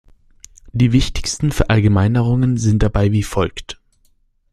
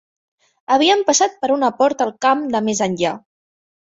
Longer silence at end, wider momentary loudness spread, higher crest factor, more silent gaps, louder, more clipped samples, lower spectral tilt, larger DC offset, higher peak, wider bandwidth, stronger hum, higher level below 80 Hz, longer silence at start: about the same, 0.8 s vs 0.75 s; first, 12 LU vs 6 LU; about the same, 16 dB vs 16 dB; neither; about the same, -17 LUFS vs -17 LUFS; neither; first, -6 dB/octave vs -3 dB/octave; neither; about the same, 0 dBFS vs -2 dBFS; first, 13.5 kHz vs 8 kHz; neither; first, -28 dBFS vs -62 dBFS; about the same, 0.65 s vs 0.7 s